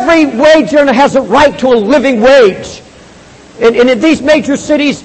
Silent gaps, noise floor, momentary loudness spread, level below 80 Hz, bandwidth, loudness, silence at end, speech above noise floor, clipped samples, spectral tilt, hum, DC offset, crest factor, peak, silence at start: none; -35 dBFS; 5 LU; -40 dBFS; 8.8 kHz; -7 LUFS; 0 s; 28 dB; 0.6%; -4.5 dB/octave; none; under 0.1%; 8 dB; 0 dBFS; 0 s